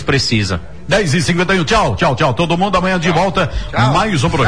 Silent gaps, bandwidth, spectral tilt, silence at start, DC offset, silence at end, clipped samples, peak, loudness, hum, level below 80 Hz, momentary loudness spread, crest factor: none; 10.5 kHz; -5 dB/octave; 0 s; 3%; 0 s; under 0.1%; -2 dBFS; -14 LUFS; none; -30 dBFS; 4 LU; 12 dB